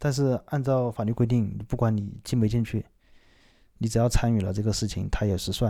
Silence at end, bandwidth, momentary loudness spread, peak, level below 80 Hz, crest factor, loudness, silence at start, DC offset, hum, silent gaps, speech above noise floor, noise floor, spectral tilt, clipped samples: 0 s; 15 kHz; 6 LU; -10 dBFS; -38 dBFS; 16 dB; -26 LUFS; 0 s; under 0.1%; none; none; 33 dB; -58 dBFS; -6.5 dB/octave; under 0.1%